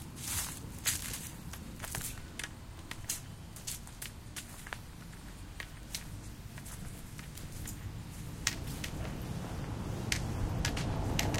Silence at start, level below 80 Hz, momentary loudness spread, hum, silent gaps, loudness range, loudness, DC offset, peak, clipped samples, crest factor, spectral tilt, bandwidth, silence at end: 0 s; -46 dBFS; 12 LU; none; none; 8 LU; -40 LUFS; under 0.1%; -8 dBFS; under 0.1%; 32 dB; -3.5 dB/octave; 17 kHz; 0 s